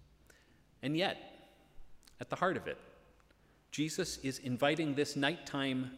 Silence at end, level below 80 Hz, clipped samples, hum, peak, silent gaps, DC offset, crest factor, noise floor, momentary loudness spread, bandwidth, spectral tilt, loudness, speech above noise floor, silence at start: 0 s; -66 dBFS; under 0.1%; none; -16 dBFS; none; under 0.1%; 22 dB; -67 dBFS; 13 LU; 16 kHz; -4.5 dB/octave; -36 LUFS; 31 dB; 0 s